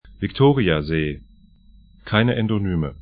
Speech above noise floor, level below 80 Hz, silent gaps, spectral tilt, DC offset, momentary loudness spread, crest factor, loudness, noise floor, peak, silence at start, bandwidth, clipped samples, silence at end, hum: 30 dB; -40 dBFS; none; -12 dB/octave; under 0.1%; 11 LU; 20 dB; -20 LUFS; -50 dBFS; -2 dBFS; 0.05 s; 5 kHz; under 0.1%; 0 s; none